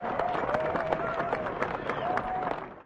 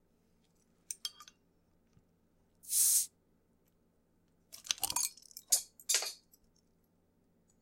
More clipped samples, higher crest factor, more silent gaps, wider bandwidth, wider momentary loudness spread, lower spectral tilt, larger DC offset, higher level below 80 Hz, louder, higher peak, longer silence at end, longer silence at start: neither; second, 20 dB vs 28 dB; neither; second, 10 kHz vs 17 kHz; second, 3 LU vs 17 LU; first, -6.5 dB/octave vs 2.5 dB/octave; neither; first, -54 dBFS vs -76 dBFS; about the same, -31 LUFS vs -32 LUFS; about the same, -10 dBFS vs -12 dBFS; second, 0 s vs 1.45 s; second, 0 s vs 0.9 s